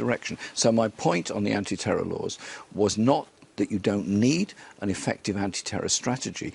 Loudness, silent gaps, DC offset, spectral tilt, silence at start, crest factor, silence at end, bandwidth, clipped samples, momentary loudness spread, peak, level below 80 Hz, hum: -26 LUFS; none; under 0.1%; -4.5 dB/octave; 0 s; 20 dB; 0 s; 11.5 kHz; under 0.1%; 9 LU; -6 dBFS; -60 dBFS; none